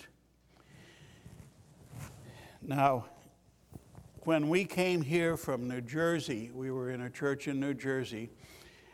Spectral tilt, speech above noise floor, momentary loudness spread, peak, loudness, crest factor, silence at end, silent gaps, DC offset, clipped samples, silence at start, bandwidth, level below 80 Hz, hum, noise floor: -6 dB/octave; 33 dB; 24 LU; -12 dBFS; -33 LUFS; 24 dB; 0.25 s; none; under 0.1%; under 0.1%; 0 s; 16.5 kHz; -66 dBFS; none; -66 dBFS